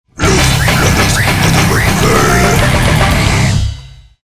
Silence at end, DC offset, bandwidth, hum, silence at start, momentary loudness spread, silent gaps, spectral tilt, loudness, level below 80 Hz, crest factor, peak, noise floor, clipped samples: 0.25 s; under 0.1%; 16 kHz; none; 0.15 s; 3 LU; none; -4.5 dB/octave; -10 LUFS; -20 dBFS; 10 dB; 0 dBFS; -32 dBFS; under 0.1%